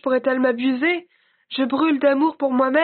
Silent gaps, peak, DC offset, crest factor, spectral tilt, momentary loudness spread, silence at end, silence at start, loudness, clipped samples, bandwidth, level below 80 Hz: none; -6 dBFS; under 0.1%; 14 dB; -1.5 dB/octave; 7 LU; 0 s; 0.05 s; -20 LUFS; under 0.1%; 4.5 kHz; -70 dBFS